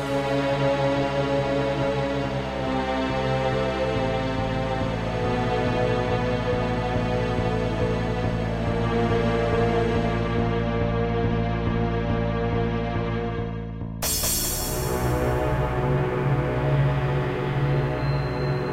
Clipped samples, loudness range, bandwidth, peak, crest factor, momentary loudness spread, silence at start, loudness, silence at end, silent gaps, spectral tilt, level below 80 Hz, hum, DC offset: under 0.1%; 2 LU; 16 kHz; -10 dBFS; 14 dB; 4 LU; 0 s; -25 LUFS; 0 s; none; -5.5 dB/octave; -34 dBFS; none; under 0.1%